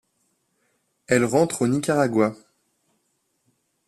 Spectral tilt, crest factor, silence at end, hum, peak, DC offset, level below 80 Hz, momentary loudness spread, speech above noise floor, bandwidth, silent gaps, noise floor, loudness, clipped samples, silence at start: -5.5 dB/octave; 20 dB; 1.55 s; none; -6 dBFS; under 0.1%; -62 dBFS; 3 LU; 51 dB; 13.5 kHz; none; -72 dBFS; -21 LUFS; under 0.1%; 1.1 s